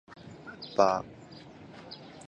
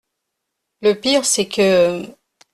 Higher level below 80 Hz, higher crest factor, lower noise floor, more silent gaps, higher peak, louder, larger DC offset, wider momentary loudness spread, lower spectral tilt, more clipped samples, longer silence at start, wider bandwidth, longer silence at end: second, -66 dBFS vs -58 dBFS; first, 26 dB vs 16 dB; second, -49 dBFS vs -77 dBFS; neither; second, -8 dBFS vs -4 dBFS; second, -28 LUFS vs -16 LUFS; neither; first, 23 LU vs 10 LU; first, -5 dB/octave vs -3 dB/octave; neither; second, 0.1 s vs 0.8 s; second, 9.4 kHz vs 13.5 kHz; second, 0.1 s vs 0.45 s